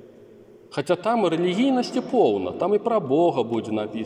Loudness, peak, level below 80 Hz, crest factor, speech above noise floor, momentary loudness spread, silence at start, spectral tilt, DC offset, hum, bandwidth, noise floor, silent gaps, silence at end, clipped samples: -22 LUFS; -8 dBFS; -70 dBFS; 16 dB; 26 dB; 6 LU; 0 s; -6.5 dB/octave; under 0.1%; none; 10.5 kHz; -48 dBFS; none; 0 s; under 0.1%